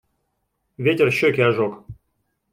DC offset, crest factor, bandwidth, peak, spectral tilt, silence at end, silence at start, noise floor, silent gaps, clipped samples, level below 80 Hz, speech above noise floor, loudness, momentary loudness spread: under 0.1%; 18 dB; 16 kHz; -4 dBFS; -6.5 dB/octave; 0.6 s; 0.8 s; -73 dBFS; none; under 0.1%; -58 dBFS; 54 dB; -19 LUFS; 9 LU